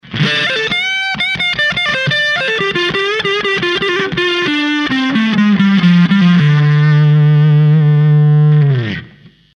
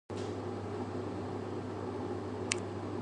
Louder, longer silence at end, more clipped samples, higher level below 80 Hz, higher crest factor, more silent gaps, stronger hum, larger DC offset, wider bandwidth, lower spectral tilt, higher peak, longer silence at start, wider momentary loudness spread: first, -11 LUFS vs -39 LUFS; first, 0.45 s vs 0 s; neither; first, -50 dBFS vs -58 dBFS; second, 12 dB vs 30 dB; neither; neither; neither; second, 6.8 kHz vs 11 kHz; first, -6.5 dB/octave vs -5 dB/octave; first, 0 dBFS vs -8 dBFS; about the same, 0.05 s vs 0.1 s; about the same, 5 LU vs 4 LU